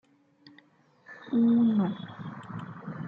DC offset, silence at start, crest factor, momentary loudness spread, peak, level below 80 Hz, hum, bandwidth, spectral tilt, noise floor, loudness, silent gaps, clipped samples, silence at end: under 0.1%; 0.45 s; 14 dB; 20 LU; -16 dBFS; -74 dBFS; none; 5 kHz; -9.5 dB/octave; -61 dBFS; -26 LUFS; none; under 0.1%; 0 s